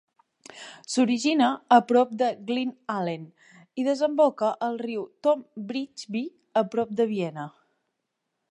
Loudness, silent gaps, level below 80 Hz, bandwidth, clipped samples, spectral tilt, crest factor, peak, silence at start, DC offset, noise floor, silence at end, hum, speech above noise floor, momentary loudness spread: -25 LUFS; none; -78 dBFS; 11 kHz; under 0.1%; -5 dB/octave; 20 dB; -6 dBFS; 0.55 s; under 0.1%; -81 dBFS; 1.05 s; none; 56 dB; 13 LU